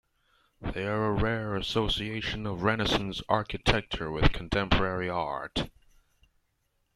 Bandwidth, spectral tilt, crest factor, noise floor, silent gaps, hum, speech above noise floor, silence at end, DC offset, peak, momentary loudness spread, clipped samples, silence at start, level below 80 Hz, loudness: 13.5 kHz; -5.5 dB/octave; 24 dB; -75 dBFS; none; none; 46 dB; 1.25 s; under 0.1%; -6 dBFS; 7 LU; under 0.1%; 0.6 s; -40 dBFS; -29 LUFS